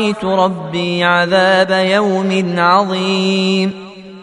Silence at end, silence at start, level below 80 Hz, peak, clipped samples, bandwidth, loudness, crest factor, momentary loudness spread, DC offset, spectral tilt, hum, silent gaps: 0 s; 0 s; -56 dBFS; 0 dBFS; under 0.1%; 10.5 kHz; -14 LUFS; 14 dB; 7 LU; under 0.1%; -5.5 dB/octave; none; none